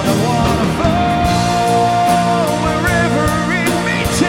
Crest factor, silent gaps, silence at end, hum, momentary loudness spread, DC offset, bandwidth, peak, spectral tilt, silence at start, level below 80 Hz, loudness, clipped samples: 12 dB; none; 0 s; none; 2 LU; under 0.1%; 17 kHz; -2 dBFS; -5 dB/octave; 0 s; -30 dBFS; -14 LUFS; under 0.1%